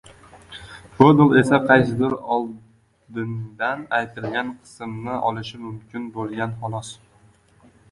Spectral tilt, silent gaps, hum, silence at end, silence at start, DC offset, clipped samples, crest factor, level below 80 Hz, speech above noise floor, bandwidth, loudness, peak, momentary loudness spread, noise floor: -7 dB/octave; none; none; 1 s; 0.35 s; under 0.1%; under 0.1%; 22 dB; -54 dBFS; 35 dB; 11.5 kHz; -20 LUFS; 0 dBFS; 21 LU; -55 dBFS